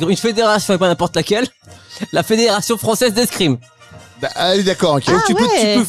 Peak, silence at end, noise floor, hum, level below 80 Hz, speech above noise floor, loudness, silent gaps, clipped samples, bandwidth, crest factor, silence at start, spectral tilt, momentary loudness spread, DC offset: -2 dBFS; 0 s; -40 dBFS; none; -50 dBFS; 26 dB; -15 LUFS; none; under 0.1%; 16 kHz; 12 dB; 0 s; -4 dB/octave; 11 LU; 0.2%